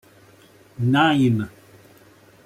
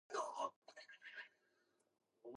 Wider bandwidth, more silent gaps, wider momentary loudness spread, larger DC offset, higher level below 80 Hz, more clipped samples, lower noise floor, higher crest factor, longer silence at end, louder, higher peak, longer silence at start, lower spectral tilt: first, 15 kHz vs 11 kHz; second, none vs 0.56-0.62 s; second, 10 LU vs 16 LU; neither; first, -60 dBFS vs under -90 dBFS; neither; second, -51 dBFS vs -82 dBFS; about the same, 16 dB vs 20 dB; first, 1 s vs 0 s; first, -19 LUFS vs -49 LUFS; first, -6 dBFS vs -30 dBFS; first, 0.8 s vs 0.1 s; first, -7 dB/octave vs -1.5 dB/octave